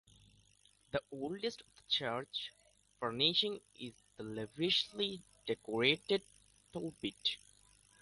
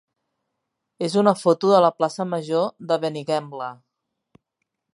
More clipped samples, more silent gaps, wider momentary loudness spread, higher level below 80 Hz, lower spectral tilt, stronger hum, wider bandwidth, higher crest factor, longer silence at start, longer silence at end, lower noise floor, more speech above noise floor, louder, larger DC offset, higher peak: neither; neither; first, 17 LU vs 13 LU; about the same, -72 dBFS vs -76 dBFS; second, -4 dB/octave vs -6 dB/octave; neither; about the same, 11.5 kHz vs 11.5 kHz; about the same, 24 dB vs 22 dB; about the same, 0.95 s vs 1 s; second, 0.65 s vs 1.25 s; second, -70 dBFS vs -79 dBFS; second, 32 dB vs 59 dB; second, -37 LUFS vs -21 LUFS; neither; second, -16 dBFS vs -2 dBFS